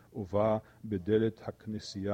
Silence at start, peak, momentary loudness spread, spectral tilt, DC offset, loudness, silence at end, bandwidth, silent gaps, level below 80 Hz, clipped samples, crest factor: 0.15 s; -16 dBFS; 11 LU; -7 dB/octave; under 0.1%; -33 LUFS; 0 s; 9 kHz; none; -64 dBFS; under 0.1%; 18 dB